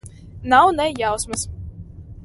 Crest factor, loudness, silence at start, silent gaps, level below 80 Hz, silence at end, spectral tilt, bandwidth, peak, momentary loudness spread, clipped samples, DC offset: 20 dB; -18 LUFS; 0.05 s; none; -40 dBFS; 0 s; -3.5 dB/octave; 12 kHz; 0 dBFS; 24 LU; under 0.1%; under 0.1%